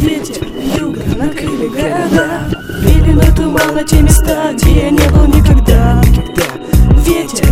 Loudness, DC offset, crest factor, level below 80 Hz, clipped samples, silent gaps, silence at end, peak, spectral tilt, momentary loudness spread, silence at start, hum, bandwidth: -11 LUFS; under 0.1%; 10 dB; -12 dBFS; 0.8%; none; 0 s; 0 dBFS; -6 dB/octave; 9 LU; 0 s; none; 16 kHz